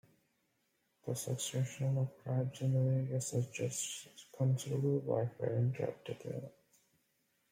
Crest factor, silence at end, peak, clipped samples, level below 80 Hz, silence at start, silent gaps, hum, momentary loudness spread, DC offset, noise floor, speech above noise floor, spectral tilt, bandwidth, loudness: 16 dB; 1 s; -20 dBFS; under 0.1%; -76 dBFS; 1.05 s; none; none; 11 LU; under 0.1%; -79 dBFS; 43 dB; -6 dB/octave; 16 kHz; -37 LUFS